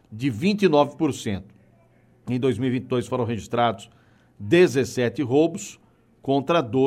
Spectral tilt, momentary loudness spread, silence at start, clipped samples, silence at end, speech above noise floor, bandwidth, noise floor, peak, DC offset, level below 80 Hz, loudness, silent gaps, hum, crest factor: -6 dB/octave; 16 LU; 0.1 s; under 0.1%; 0 s; 35 dB; 14.5 kHz; -57 dBFS; -6 dBFS; under 0.1%; -60 dBFS; -23 LUFS; none; none; 18 dB